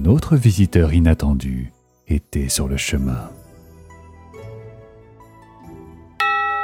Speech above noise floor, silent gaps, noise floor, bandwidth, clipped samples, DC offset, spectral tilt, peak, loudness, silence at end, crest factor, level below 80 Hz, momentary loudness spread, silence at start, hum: 28 dB; none; -45 dBFS; 16.5 kHz; under 0.1%; under 0.1%; -5.5 dB/octave; 0 dBFS; -19 LUFS; 0 s; 20 dB; -28 dBFS; 23 LU; 0 s; none